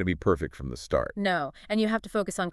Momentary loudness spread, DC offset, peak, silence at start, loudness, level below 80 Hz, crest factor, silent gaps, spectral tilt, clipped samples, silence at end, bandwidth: 4 LU; under 0.1%; -10 dBFS; 0 s; -29 LUFS; -46 dBFS; 18 dB; none; -5.5 dB/octave; under 0.1%; 0 s; 12.5 kHz